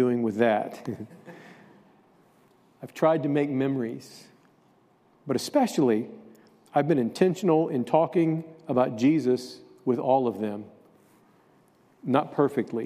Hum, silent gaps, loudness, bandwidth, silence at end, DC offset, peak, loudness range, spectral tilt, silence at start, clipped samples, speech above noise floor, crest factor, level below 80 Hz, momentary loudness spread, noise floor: none; none; -26 LUFS; 15 kHz; 0 s; under 0.1%; -6 dBFS; 5 LU; -7 dB/octave; 0 s; under 0.1%; 37 dB; 22 dB; -76 dBFS; 17 LU; -62 dBFS